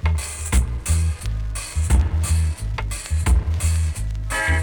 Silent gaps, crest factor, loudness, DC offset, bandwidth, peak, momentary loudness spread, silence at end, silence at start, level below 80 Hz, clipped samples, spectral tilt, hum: none; 14 dB; -23 LUFS; under 0.1%; over 20 kHz; -6 dBFS; 7 LU; 0 s; 0 s; -22 dBFS; under 0.1%; -4.5 dB/octave; none